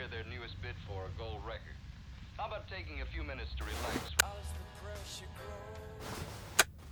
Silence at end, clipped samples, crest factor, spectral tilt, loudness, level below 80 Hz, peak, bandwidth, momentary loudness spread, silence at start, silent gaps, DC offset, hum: 0 s; under 0.1%; 30 dB; -2.5 dB/octave; -39 LUFS; -48 dBFS; -10 dBFS; over 20 kHz; 15 LU; 0 s; none; under 0.1%; none